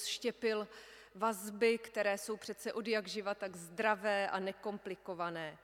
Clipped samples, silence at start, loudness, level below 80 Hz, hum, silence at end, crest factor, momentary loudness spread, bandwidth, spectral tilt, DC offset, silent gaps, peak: under 0.1%; 0 s; -37 LUFS; -78 dBFS; none; 0.05 s; 20 dB; 11 LU; 17 kHz; -3.5 dB/octave; under 0.1%; none; -18 dBFS